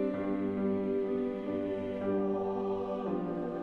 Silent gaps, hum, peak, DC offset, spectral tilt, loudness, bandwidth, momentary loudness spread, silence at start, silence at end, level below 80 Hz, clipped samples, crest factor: none; none; -20 dBFS; under 0.1%; -9.5 dB/octave; -34 LUFS; 5 kHz; 3 LU; 0 s; 0 s; -62 dBFS; under 0.1%; 12 dB